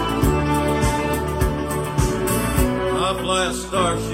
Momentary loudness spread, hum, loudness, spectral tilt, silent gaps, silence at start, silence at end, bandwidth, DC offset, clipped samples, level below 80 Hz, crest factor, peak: 3 LU; none; -21 LUFS; -5 dB/octave; none; 0 s; 0 s; 16.5 kHz; under 0.1%; under 0.1%; -28 dBFS; 16 dB; -4 dBFS